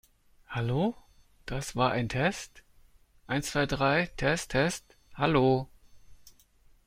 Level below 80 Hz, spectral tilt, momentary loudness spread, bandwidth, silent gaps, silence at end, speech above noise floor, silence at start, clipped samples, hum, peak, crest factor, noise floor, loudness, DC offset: -50 dBFS; -5 dB/octave; 15 LU; 16 kHz; none; 0.55 s; 33 dB; 0.5 s; under 0.1%; none; -10 dBFS; 20 dB; -61 dBFS; -29 LUFS; under 0.1%